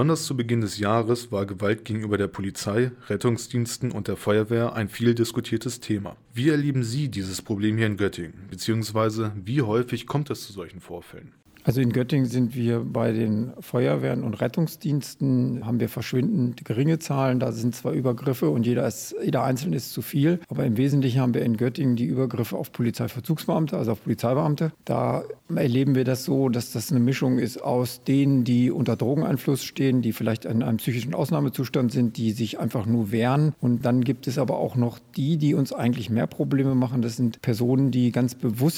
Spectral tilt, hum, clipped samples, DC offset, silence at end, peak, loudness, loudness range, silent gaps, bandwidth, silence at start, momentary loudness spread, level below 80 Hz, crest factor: -7 dB/octave; none; under 0.1%; under 0.1%; 0 s; -6 dBFS; -25 LUFS; 3 LU; none; 17 kHz; 0 s; 6 LU; -60 dBFS; 18 dB